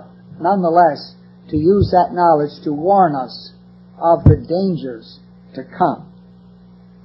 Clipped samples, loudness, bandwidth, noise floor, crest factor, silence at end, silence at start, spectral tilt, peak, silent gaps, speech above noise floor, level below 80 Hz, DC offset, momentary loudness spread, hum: under 0.1%; -16 LUFS; 5.8 kHz; -44 dBFS; 16 dB; 1.05 s; 0.3 s; -11 dB/octave; 0 dBFS; none; 28 dB; -34 dBFS; under 0.1%; 20 LU; 60 Hz at -40 dBFS